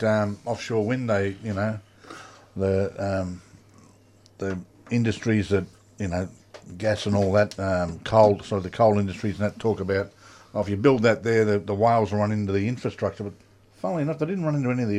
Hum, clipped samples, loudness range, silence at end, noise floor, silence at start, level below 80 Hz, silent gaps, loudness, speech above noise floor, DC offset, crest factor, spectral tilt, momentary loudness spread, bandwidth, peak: none; under 0.1%; 6 LU; 0 s; -55 dBFS; 0 s; -56 dBFS; none; -25 LUFS; 31 dB; under 0.1%; 22 dB; -7 dB/octave; 15 LU; 11 kHz; -4 dBFS